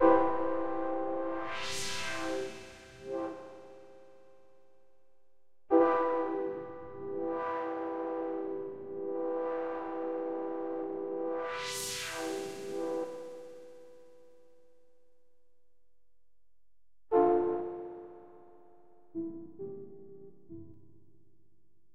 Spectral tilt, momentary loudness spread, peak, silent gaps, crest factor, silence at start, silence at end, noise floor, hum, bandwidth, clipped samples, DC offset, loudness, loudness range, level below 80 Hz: -4 dB/octave; 23 LU; -12 dBFS; none; 24 dB; 0 s; 0 s; -82 dBFS; none; 15.5 kHz; under 0.1%; under 0.1%; -34 LUFS; 13 LU; -70 dBFS